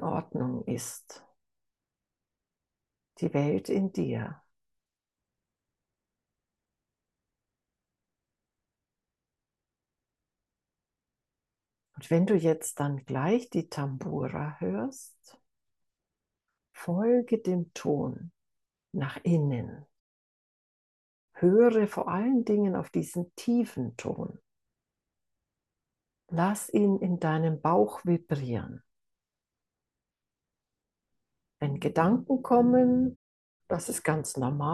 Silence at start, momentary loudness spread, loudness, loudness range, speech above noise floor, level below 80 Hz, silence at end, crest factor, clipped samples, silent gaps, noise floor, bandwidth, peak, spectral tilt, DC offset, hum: 0 s; 12 LU; -28 LUFS; 10 LU; over 62 dB; -70 dBFS; 0 s; 22 dB; under 0.1%; 20.00-21.28 s, 33.16-33.60 s; under -90 dBFS; 12.5 kHz; -10 dBFS; -7 dB/octave; under 0.1%; none